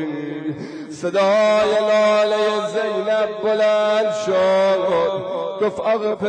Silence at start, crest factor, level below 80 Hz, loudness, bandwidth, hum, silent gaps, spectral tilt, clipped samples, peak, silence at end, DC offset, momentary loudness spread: 0 s; 8 dB; -62 dBFS; -18 LUFS; 9.8 kHz; none; none; -4.5 dB/octave; under 0.1%; -10 dBFS; 0 s; under 0.1%; 11 LU